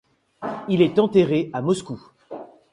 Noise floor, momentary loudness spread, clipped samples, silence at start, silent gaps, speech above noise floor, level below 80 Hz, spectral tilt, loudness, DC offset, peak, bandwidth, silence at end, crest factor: -39 dBFS; 21 LU; under 0.1%; 0.4 s; none; 19 dB; -60 dBFS; -7 dB/octave; -21 LUFS; under 0.1%; -4 dBFS; 11 kHz; 0.25 s; 18 dB